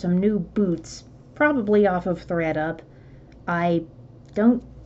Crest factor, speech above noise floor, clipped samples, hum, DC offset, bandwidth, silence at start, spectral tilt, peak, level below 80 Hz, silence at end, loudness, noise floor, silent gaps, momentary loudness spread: 16 dB; 24 dB; under 0.1%; none; under 0.1%; 8 kHz; 0 s; -7.5 dB/octave; -6 dBFS; -50 dBFS; 0 s; -23 LUFS; -46 dBFS; none; 17 LU